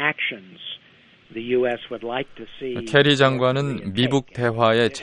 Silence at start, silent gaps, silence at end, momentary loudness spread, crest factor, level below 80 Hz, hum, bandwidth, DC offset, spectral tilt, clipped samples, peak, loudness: 0 s; none; 0 s; 18 LU; 20 dB; -58 dBFS; none; 11.5 kHz; under 0.1%; -5.5 dB/octave; under 0.1%; -2 dBFS; -21 LUFS